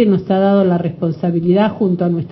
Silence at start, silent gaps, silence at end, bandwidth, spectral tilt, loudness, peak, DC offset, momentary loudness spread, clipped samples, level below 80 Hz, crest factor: 0 s; none; 0 s; 5.6 kHz; -11 dB/octave; -15 LUFS; 0 dBFS; under 0.1%; 5 LU; under 0.1%; -52 dBFS; 14 dB